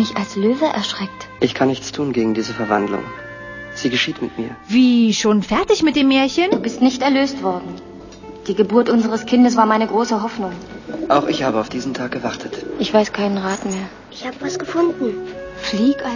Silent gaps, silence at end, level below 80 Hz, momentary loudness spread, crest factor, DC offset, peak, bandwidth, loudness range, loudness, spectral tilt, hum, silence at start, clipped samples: none; 0 s; -50 dBFS; 16 LU; 18 dB; under 0.1%; 0 dBFS; 7.4 kHz; 5 LU; -18 LUFS; -5 dB/octave; none; 0 s; under 0.1%